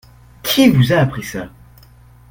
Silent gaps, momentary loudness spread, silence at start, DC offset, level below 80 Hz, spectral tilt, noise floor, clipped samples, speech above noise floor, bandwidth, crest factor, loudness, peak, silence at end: none; 17 LU; 0.45 s; under 0.1%; -44 dBFS; -5.5 dB/octave; -44 dBFS; under 0.1%; 31 dB; 17 kHz; 18 dB; -14 LUFS; 0 dBFS; 0.85 s